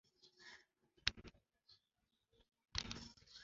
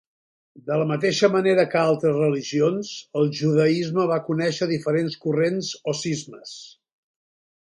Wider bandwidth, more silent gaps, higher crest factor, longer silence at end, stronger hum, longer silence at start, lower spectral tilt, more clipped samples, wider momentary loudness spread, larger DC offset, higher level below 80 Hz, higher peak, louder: second, 7.6 kHz vs 11.5 kHz; neither; first, 36 dB vs 18 dB; second, 0 s vs 0.95 s; neither; second, 0.25 s vs 0.55 s; second, -1 dB/octave vs -5.5 dB/octave; neither; first, 20 LU vs 11 LU; neither; about the same, -64 dBFS vs -68 dBFS; second, -16 dBFS vs -4 dBFS; second, -46 LUFS vs -22 LUFS